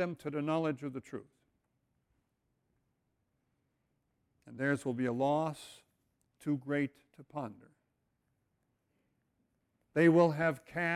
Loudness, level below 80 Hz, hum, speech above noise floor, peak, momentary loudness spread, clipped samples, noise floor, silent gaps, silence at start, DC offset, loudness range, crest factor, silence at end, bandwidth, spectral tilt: -33 LUFS; -76 dBFS; none; 48 dB; -14 dBFS; 20 LU; under 0.1%; -81 dBFS; none; 0 s; under 0.1%; 12 LU; 22 dB; 0 s; 13.5 kHz; -7.5 dB/octave